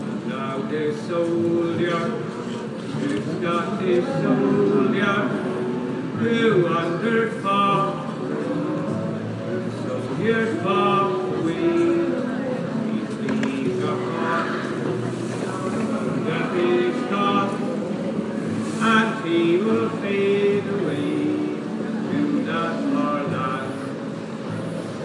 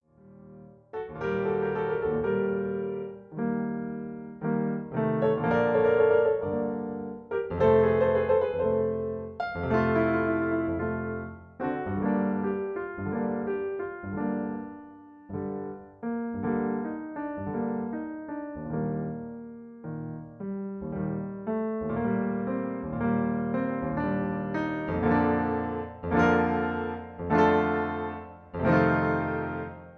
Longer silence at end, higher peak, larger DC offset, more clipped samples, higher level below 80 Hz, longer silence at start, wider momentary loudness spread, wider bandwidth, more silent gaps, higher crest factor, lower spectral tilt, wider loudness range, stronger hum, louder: about the same, 0 s vs 0 s; first, -6 dBFS vs -10 dBFS; neither; neither; second, -66 dBFS vs -52 dBFS; second, 0 s vs 0.25 s; second, 8 LU vs 14 LU; first, 11.5 kHz vs 6.6 kHz; neither; about the same, 16 dB vs 18 dB; second, -6.5 dB/octave vs -9.5 dB/octave; second, 3 LU vs 8 LU; neither; first, -23 LUFS vs -28 LUFS